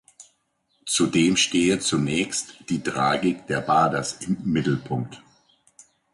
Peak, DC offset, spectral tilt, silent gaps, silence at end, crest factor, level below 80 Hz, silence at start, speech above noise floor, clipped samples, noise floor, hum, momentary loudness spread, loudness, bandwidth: -8 dBFS; under 0.1%; -4 dB/octave; none; 0.95 s; 16 dB; -56 dBFS; 0.2 s; 47 dB; under 0.1%; -70 dBFS; none; 10 LU; -23 LUFS; 11.5 kHz